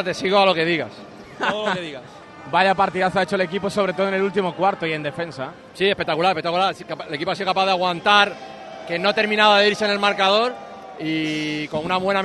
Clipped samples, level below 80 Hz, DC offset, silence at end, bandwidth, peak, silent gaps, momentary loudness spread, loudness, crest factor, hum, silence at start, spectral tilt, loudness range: under 0.1%; -60 dBFS; under 0.1%; 0 s; 12 kHz; 0 dBFS; none; 17 LU; -20 LUFS; 20 dB; none; 0 s; -4.5 dB/octave; 4 LU